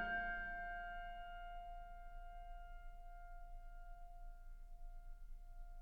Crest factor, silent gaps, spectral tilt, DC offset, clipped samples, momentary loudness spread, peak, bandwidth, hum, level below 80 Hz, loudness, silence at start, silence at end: 18 dB; none; -5.5 dB/octave; under 0.1%; under 0.1%; 16 LU; -32 dBFS; 4.6 kHz; none; -54 dBFS; -52 LUFS; 0 s; 0 s